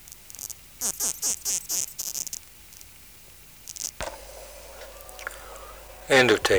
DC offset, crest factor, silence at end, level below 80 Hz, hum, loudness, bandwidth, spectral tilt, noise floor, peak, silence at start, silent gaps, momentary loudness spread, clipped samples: under 0.1%; 22 dB; 0 s; -52 dBFS; none; -26 LUFS; over 20 kHz; -1.5 dB/octave; -49 dBFS; -8 dBFS; 0 s; none; 23 LU; under 0.1%